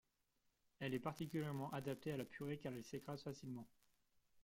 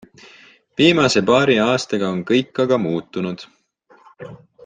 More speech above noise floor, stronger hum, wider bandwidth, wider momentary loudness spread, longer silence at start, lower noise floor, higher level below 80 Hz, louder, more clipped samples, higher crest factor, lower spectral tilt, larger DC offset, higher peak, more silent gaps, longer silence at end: about the same, 37 dB vs 36 dB; neither; first, 16.5 kHz vs 9.6 kHz; second, 7 LU vs 23 LU; about the same, 0.8 s vs 0.8 s; first, -84 dBFS vs -54 dBFS; second, -78 dBFS vs -56 dBFS; second, -48 LUFS vs -17 LUFS; neither; about the same, 20 dB vs 18 dB; first, -6.5 dB/octave vs -5 dB/octave; neither; second, -30 dBFS vs -2 dBFS; neither; second, 0 s vs 0.3 s